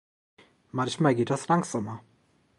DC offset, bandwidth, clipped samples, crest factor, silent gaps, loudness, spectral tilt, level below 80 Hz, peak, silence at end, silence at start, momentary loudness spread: under 0.1%; 11.5 kHz; under 0.1%; 22 dB; none; -27 LUFS; -6 dB/octave; -68 dBFS; -8 dBFS; 0.6 s; 0.75 s; 13 LU